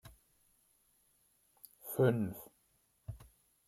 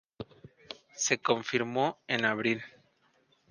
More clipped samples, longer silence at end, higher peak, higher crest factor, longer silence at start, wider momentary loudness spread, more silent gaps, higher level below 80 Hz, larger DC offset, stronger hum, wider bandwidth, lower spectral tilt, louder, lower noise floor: neither; second, 0.45 s vs 0.85 s; second, -16 dBFS vs -10 dBFS; about the same, 24 dB vs 22 dB; second, 0.05 s vs 0.2 s; first, 23 LU vs 19 LU; neither; first, -66 dBFS vs -72 dBFS; neither; neither; first, 15.5 kHz vs 10.5 kHz; first, -7 dB/octave vs -3 dB/octave; second, -34 LUFS vs -30 LUFS; first, -75 dBFS vs -69 dBFS